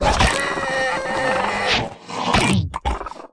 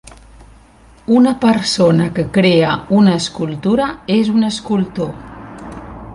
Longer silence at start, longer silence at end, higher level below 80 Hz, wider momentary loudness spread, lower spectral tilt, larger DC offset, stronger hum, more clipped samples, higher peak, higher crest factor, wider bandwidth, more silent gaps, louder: about the same, 0 s vs 0.05 s; about the same, 0.05 s vs 0 s; first, -32 dBFS vs -44 dBFS; second, 9 LU vs 20 LU; second, -4 dB/octave vs -6 dB/octave; neither; neither; neither; about the same, -4 dBFS vs -2 dBFS; about the same, 16 dB vs 14 dB; about the same, 10.5 kHz vs 11.5 kHz; neither; second, -20 LUFS vs -14 LUFS